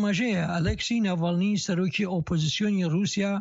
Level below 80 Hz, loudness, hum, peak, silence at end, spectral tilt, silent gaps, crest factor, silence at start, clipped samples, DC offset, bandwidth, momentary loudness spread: -46 dBFS; -26 LUFS; none; -16 dBFS; 0 s; -5.5 dB/octave; none; 10 dB; 0 s; under 0.1%; under 0.1%; 8 kHz; 2 LU